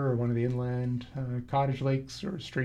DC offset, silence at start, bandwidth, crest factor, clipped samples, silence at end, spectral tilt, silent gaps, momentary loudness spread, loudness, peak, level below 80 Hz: under 0.1%; 0 s; 9.2 kHz; 14 dB; under 0.1%; 0 s; -7.5 dB/octave; none; 7 LU; -31 LUFS; -18 dBFS; -56 dBFS